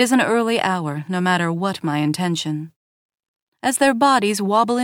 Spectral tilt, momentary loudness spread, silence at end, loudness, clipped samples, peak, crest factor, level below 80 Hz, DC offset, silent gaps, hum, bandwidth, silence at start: -4.5 dB/octave; 9 LU; 0 s; -19 LUFS; under 0.1%; -4 dBFS; 16 dB; -68 dBFS; under 0.1%; 2.76-3.09 s, 3.28-3.34 s, 3.42-3.52 s; none; 17 kHz; 0 s